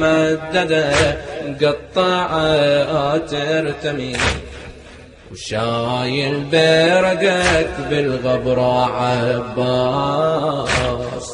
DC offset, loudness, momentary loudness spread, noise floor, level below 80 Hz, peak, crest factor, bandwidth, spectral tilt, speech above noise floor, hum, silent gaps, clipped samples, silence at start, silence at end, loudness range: under 0.1%; -17 LUFS; 8 LU; -40 dBFS; -38 dBFS; -2 dBFS; 16 dB; 10.5 kHz; -5 dB/octave; 23 dB; none; none; under 0.1%; 0 s; 0 s; 5 LU